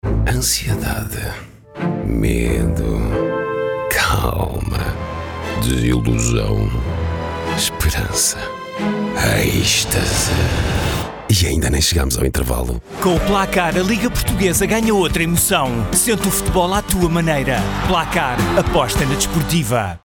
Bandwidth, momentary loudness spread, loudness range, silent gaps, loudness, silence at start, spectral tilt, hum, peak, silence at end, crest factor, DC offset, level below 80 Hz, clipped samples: over 20 kHz; 7 LU; 4 LU; none; -17 LUFS; 0.05 s; -4 dB/octave; none; -2 dBFS; 0.1 s; 16 dB; under 0.1%; -26 dBFS; under 0.1%